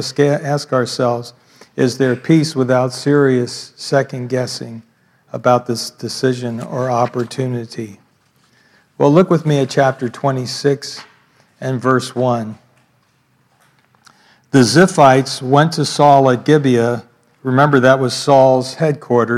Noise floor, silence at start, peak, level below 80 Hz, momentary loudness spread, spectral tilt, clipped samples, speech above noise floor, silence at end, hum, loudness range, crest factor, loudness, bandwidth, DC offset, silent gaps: -58 dBFS; 0 s; 0 dBFS; -64 dBFS; 14 LU; -6 dB/octave; under 0.1%; 44 dB; 0 s; none; 8 LU; 16 dB; -15 LUFS; 14 kHz; under 0.1%; none